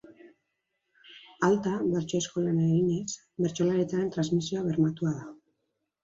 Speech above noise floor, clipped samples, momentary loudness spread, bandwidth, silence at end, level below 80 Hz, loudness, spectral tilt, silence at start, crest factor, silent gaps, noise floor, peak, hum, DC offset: 53 dB; under 0.1%; 7 LU; 7.8 kHz; 0.7 s; -66 dBFS; -28 LUFS; -6.5 dB/octave; 0.1 s; 16 dB; none; -80 dBFS; -12 dBFS; none; under 0.1%